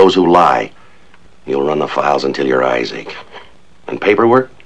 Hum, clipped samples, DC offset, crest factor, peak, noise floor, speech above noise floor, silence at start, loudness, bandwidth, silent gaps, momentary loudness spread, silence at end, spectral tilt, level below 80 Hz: none; 0.4%; 1%; 14 dB; 0 dBFS; -47 dBFS; 34 dB; 0 s; -13 LUFS; 9.6 kHz; none; 18 LU; 0.2 s; -6 dB/octave; -54 dBFS